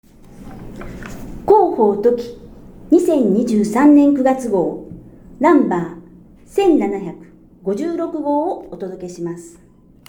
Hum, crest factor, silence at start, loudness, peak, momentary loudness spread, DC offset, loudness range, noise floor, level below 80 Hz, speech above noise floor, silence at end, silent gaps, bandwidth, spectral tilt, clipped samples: none; 16 dB; 0.35 s; -16 LUFS; 0 dBFS; 21 LU; under 0.1%; 6 LU; -42 dBFS; -44 dBFS; 27 dB; 0.6 s; none; 16 kHz; -7 dB/octave; under 0.1%